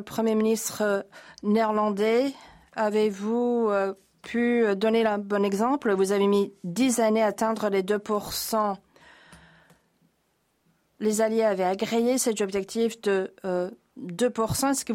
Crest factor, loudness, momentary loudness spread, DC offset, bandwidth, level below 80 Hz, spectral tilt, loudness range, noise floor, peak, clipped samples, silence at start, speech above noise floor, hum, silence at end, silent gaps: 12 dB; -25 LUFS; 7 LU; under 0.1%; 16.5 kHz; -62 dBFS; -4.5 dB/octave; 6 LU; -71 dBFS; -12 dBFS; under 0.1%; 0 s; 46 dB; none; 0 s; none